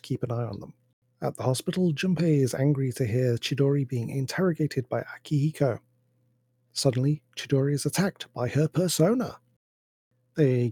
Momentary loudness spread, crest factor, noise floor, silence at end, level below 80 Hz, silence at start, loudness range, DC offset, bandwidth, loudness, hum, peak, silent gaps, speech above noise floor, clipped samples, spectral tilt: 9 LU; 18 dB; -69 dBFS; 0 s; -66 dBFS; 0.05 s; 3 LU; under 0.1%; 16.5 kHz; -27 LUFS; none; -8 dBFS; 0.93-1.02 s, 9.56-10.11 s; 44 dB; under 0.1%; -6 dB/octave